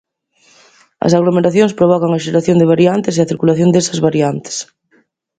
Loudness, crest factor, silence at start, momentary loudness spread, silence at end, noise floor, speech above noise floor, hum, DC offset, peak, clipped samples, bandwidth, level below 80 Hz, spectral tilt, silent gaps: -13 LUFS; 14 dB; 1 s; 8 LU; 0.75 s; -56 dBFS; 44 dB; none; under 0.1%; 0 dBFS; under 0.1%; 9.2 kHz; -54 dBFS; -6 dB/octave; none